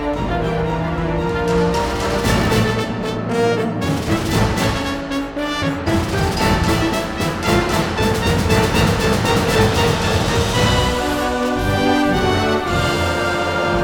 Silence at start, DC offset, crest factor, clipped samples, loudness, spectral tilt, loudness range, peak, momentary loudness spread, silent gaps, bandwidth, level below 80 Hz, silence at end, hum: 0 s; under 0.1%; 16 dB; under 0.1%; -18 LUFS; -5 dB/octave; 3 LU; -2 dBFS; 5 LU; none; over 20 kHz; -30 dBFS; 0 s; none